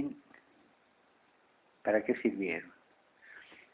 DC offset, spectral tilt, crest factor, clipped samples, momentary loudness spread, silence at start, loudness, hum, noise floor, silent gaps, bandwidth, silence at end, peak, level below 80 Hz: under 0.1%; -5 dB/octave; 22 dB; under 0.1%; 23 LU; 0 s; -34 LUFS; none; -68 dBFS; none; 4 kHz; 0.2 s; -16 dBFS; -76 dBFS